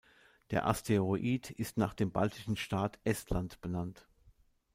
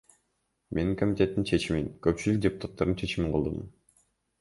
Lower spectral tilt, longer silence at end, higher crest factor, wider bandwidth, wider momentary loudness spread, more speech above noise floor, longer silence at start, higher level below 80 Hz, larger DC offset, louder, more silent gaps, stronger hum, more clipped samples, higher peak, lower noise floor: about the same, -6 dB/octave vs -6.5 dB/octave; second, 0.45 s vs 0.7 s; about the same, 20 dB vs 20 dB; first, 16 kHz vs 11.5 kHz; about the same, 8 LU vs 7 LU; second, 32 dB vs 49 dB; second, 0.5 s vs 0.7 s; second, -52 dBFS vs -46 dBFS; neither; second, -35 LUFS vs -29 LUFS; neither; neither; neither; second, -14 dBFS vs -10 dBFS; second, -66 dBFS vs -77 dBFS